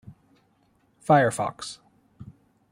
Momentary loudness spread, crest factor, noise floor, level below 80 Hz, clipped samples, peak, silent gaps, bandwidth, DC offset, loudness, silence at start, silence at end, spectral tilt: 20 LU; 22 dB; -65 dBFS; -64 dBFS; under 0.1%; -6 dBFS; none; 16 kHz; under 0.1%; -23 LUFS; 0.1 s; 0.5 s; -5.5 dB/octave